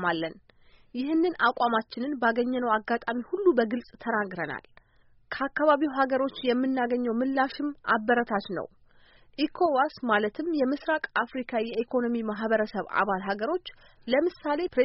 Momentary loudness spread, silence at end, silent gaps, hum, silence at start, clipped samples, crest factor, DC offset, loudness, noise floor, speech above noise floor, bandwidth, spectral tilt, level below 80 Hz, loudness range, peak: 10 LU; 0 s; none; none; 0 s; under 0.1%; 18 dB; under 0.1%; -27 LUFS; -60 dBFS; 33 dB; 5.8 kHz; -3 dB/octave; -62 dBFS; 2 LU; -10 dBFS